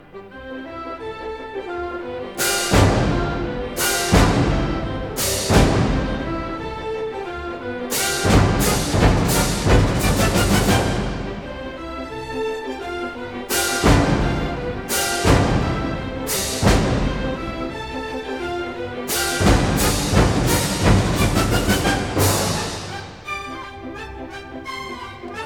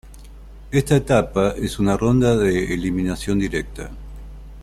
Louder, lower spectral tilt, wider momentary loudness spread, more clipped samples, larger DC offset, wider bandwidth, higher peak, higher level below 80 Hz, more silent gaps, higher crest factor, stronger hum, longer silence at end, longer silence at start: about the same, -20 LUFS vs -20 LUFS; second, -4.5 dB/octave vs -6.5 dB/octave; second, 15 LU vs 19 LU; neither; first, 0.2% vs under 0.1%; first, over 20 kHz vs 14.5 kHz; about the same, -2 dBFS vs -4 dBFS; first, -28 dBFS vs -36 dBFS; neither; about the same, 18 dB vs 18 dB; neither; about the same, 0 s vs 0 s; about the same, 0.15 s vs 0.05 s